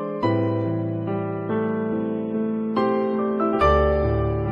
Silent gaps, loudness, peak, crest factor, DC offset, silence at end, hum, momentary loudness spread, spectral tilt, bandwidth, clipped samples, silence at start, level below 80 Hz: none; -23 LUFS; -6 dBFS; 16 dB; under 0.1%; 0 s; none; 7 LU; -9.5 dB/octave; 6.4 kHz; under 0.1%; 0 s; -34 dBFS